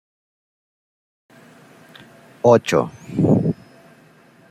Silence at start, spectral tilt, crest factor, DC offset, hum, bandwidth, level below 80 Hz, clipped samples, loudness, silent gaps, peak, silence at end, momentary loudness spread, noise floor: 2.45 s; -7 dB/octave; 20 dB; under 0.1%; none; 15 kHz; -58 dBFS; under 0.1%; -18 LUFS; none; -2 dBFS; 0.95 s; 11 LU; -51 dBFS